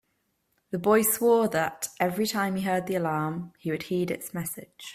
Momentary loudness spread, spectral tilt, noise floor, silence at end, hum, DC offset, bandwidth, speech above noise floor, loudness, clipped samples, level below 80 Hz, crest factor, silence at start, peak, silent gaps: 12 LU; -4.5 dB/octave; -75 dBFS; 0 s; none; under 0.1%; 16 kHz; 48 dB; -27 LUFS; under 0.1%; -66 dBFS; 18 dB; 0.7 s; -10 dBFS; none